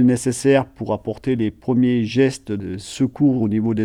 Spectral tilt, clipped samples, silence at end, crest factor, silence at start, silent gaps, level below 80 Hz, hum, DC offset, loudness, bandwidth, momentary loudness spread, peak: -6.5 dB/octave; under 0.1%; 0 s; 14 dB; 0 s; none; -50 dBFS; none; under 0.1%; -20 LUFS; 12.5 kHz; 9 LU; -4 dBFS